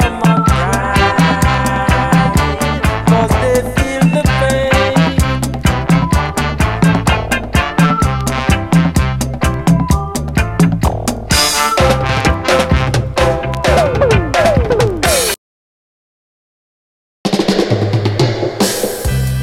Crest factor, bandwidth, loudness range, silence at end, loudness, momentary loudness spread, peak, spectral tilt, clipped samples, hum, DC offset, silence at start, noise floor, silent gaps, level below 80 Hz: 12 dB; 16.5 kHz; 4 LU; 0 s; -13 LUFS; 5 LU; 0 dBFS; -5 dB/octave; under 0.1%; none; under 0.1%; 0 s; under -90 dBFS; 15.38-17.24 s; -22 dBFS